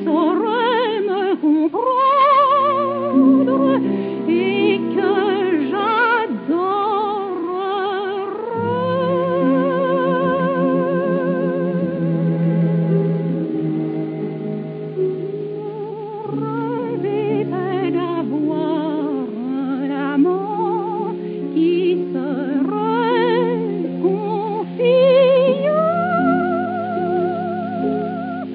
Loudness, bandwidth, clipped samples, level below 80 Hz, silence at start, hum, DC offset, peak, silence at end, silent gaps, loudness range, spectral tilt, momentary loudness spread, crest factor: -19 LUFS; 4.9 kHz; under 0.1%; -72 dBFS; 0 s; none; under 0.1%; -4 dBFS; 0 s; none; 7 LU; -12 dB/octave; 9 LU; 14 dB